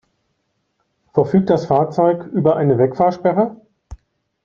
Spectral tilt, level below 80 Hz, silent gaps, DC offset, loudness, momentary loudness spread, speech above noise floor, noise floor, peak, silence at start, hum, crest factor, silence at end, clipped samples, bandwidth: -9.5 dB/octave; -48 dBFS; none; under 0.1%; -17 LUFS; 5 LU; 54 dB; -69 dBFS; 0 dBFS; 1.15 s; none; 18 dB; 0.5 s; under 0.1%; 7 kHz